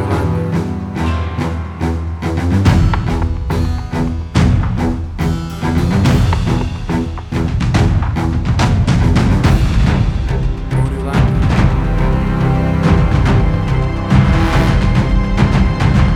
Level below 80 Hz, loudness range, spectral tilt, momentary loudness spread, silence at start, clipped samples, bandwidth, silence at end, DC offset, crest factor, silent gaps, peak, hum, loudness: -18 dBFS; 3 LU; -7.5 dB/octave; 7 LU; 0 s; under 0.1%; 12.5 kHz; 0 s; under 0.1%; 12 dB; none; 0 dBFS; none; -15 LUFS